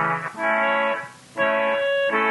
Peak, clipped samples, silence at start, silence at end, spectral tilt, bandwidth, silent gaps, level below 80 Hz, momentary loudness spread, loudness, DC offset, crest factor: -8 dBFS; under 0.1%; 0 s; 0 s; -4.5 dB/octave; 11.5 kHz; none; -72 dBFS; 6 LU; -22 LUFS; under 0.1%; 14 dB